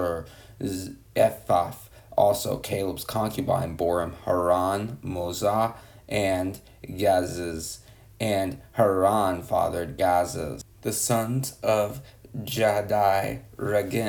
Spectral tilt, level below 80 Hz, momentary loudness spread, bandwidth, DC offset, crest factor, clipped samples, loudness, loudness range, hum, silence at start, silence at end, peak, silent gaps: -5 dB/octave; -52 dBFS; 12 LU; 19.5 kHz; under 0.1%; 20 dB; under 0.1%; -26 LUFS; 2 LU; none; 0 s; 0 s; -6 dBFS; none